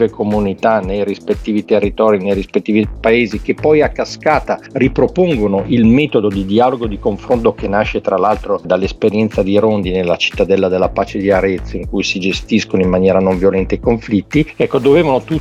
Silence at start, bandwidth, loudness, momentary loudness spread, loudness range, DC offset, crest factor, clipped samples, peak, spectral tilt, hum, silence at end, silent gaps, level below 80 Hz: 0 s; 10.5 kHz; -14 LUFS; 6 LU; 1 LU; under 0.1%; 14 dB; under 0.1%; 0 dBFS; -6.5 dB/octave; none; 0 s; none; -32 dBFS